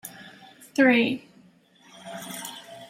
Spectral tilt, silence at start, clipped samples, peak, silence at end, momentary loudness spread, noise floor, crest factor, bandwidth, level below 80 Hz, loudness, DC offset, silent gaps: -4 dB/octave; 0.05 s; under 0.1%; -8 dBFS; 0.05 s; 26 LU; -57 dBFS; 20 dB; 16 kHz; -74 dBFS; -24 LUFS; under 0.1%; none